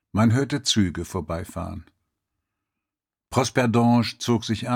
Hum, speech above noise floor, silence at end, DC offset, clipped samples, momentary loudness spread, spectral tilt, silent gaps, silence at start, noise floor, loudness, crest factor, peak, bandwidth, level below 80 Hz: none; 66 dB; 0 s; under 0.1%; under 0.1%; 13 LU; -5 dB/octave; none; 0.15 s; -89 dBFS; -23 LUFS; 18 dB; -6 dBFS; 16 kHz; -50 dBFS